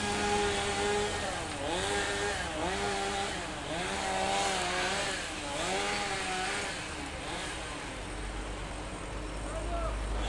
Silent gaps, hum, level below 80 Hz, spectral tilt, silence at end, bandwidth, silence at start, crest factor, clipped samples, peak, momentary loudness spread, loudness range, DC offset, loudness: none; none; -44 dBFS; -3 dB/octave; 0 s; 11.5 kHz; 0 s; 16 dB; under 0.1%; -16 dBFS; 10 LU; 6 LU; under 0.1%; -33 LUFS